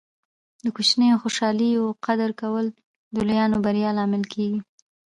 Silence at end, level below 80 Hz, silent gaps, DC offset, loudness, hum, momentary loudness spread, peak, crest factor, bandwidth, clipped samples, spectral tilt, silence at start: 0.45 s; -58 dBFS; 2.85-3.11 s; under 0.1%; -23 LUFS; none; 11 LU; -6 dBFS; 16 dB; 11 kHz; under 0.1%; -5 dB/octave; 0.65 s